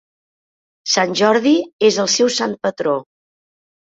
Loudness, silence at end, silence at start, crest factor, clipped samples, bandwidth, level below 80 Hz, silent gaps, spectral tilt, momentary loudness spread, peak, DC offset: -16 LUFS; 0.85 s; 0.85 s; 16 dB; under 0.1%; 8 kHz; -64 dBFS; 1.73-1.79 s; -3 dB/octave; 7 LU; -2 dBFS; under 0.1%